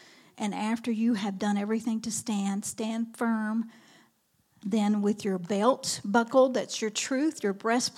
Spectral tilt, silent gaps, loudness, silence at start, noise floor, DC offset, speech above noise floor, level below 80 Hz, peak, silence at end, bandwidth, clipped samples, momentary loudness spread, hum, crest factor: -4.5 dB/octave; none; -28 LUFS; 0.35 s; -70 dBFS; under 0.1%; 42 dB; -78 dBFS; -10 dBFS; 0.05 s; 14.5 kHz; under 0.1%; 7 LU; none; 20 dB